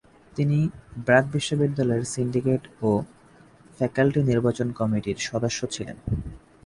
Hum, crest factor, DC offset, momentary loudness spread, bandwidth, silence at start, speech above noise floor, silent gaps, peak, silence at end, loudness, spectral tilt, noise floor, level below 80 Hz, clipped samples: none; 20 dB; under 0.1%; 11 LU; 11.5 kHz; 0.35 s; 29 dB; none; -4 dBFS; 0.3 s; -25 LUFS; -6 dB/octave; -53 dBFS; -46 dBFS; under 0.1%